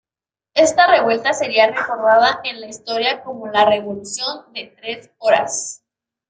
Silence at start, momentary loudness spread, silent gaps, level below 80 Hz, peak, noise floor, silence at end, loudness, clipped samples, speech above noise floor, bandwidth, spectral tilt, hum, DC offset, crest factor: 0.55 s; 16 LU; none; -62 dBFS; -2 dBFS; under -90 dBFS; 0.55 s; -17 LUFS; under 0.1%; over 73 dB; 9.6 kHz; -2 dB/octave; none; under 0.1%; 16 dB